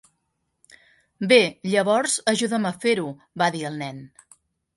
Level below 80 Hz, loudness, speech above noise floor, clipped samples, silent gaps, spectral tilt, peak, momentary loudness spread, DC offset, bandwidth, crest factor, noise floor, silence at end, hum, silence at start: -70 dBFS; -22 LUFS; 53 dB; under 0.1%; none; -3.5 dB/octave; -4 dBFS; 16 LU; under 0.1%; 11.5 kHz; 20 dB; -75 dBFS; 0.7 s; none; 1.2 s